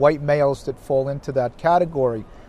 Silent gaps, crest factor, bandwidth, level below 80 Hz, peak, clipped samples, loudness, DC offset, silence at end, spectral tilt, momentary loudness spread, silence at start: none; 18 dB; 11.5 kHz; -46 dBFS; -4 dBFS; under 0.1%; -21 LUFS; under 0.1%; 0.05 s; -7.5 dB/octave; 6 LU; 0 s